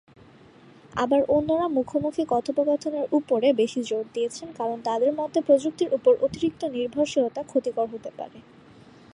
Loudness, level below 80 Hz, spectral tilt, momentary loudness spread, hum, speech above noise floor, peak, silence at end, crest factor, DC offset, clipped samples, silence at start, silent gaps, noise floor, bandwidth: -25 LUFS; -60 dBFS; -5.5 dB/octave; 9 LU; none; 27 dB; -8 dBFS; 0.75 s; 18 dB; under 0.1%; under 0.1%; 0.95 s; none; -51 dBFS; 10.5 kHz